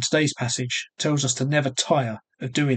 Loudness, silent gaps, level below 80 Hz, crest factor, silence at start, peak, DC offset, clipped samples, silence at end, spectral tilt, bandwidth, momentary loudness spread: -24 LUFS; none; -66 dBFS; 18 dB; 0 s; -6 dBFS; under 0.1%; under 0.1%; 0 s; -4 dB/octave; 9.4 kHz; 6 LU